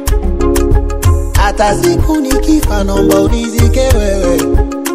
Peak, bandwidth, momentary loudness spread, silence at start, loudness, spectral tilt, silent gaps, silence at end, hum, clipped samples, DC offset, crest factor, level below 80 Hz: 0 dBFS; 15.5 kHz; 4 LU; 0 s; -12 LUFS; -6 dB/octave; none; 0 s; none; 0.4%; under 0.1%; 10 dB; -14 dBFS